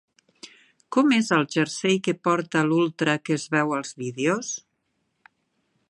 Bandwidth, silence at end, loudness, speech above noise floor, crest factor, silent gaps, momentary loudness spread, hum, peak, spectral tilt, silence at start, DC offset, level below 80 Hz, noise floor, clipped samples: 11.5 kHz; 1.3 s; -23 LUFS; 51 dB; 20 dB; none; 8 LU; none; -6 dBFS; -4.5 dB/octave; 0.45 s; under 0.1%; -74 dBFS; -74 dBFS; under 0.1%